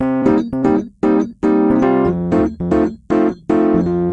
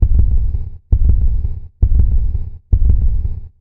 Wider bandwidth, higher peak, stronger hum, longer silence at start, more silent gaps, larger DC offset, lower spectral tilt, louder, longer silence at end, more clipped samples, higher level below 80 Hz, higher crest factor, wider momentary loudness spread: first, 7.8 kHz vs 1.1 kHz; about the same, 0 dBFS vs 0 dBFS; neither; about the same, 0 s vs 0 s; neither; neither; second, -9 dB/octave vs -12.5 dB/octave; about the same, -16 LUFS vs -18 LUFS; about the same, 0 s vs 0.1 s; neither; second, -40 dBFS vs -14 dBFS; about the same, 14 dB vs 12 dB; second, 3 LU vs 10 LU